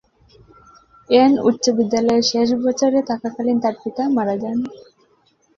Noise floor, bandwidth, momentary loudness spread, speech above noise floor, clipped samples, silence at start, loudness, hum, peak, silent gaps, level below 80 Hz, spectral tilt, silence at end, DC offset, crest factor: -60 dBFS; 7.6 kHz; 9 LU; 42 dB; under 0.1%; 1.1 s; -18 LUFS; none; -2 dBFS; none; -58 dBFS; -4.5 dB/octave; 0.75 s; under 0.1%; 18 dB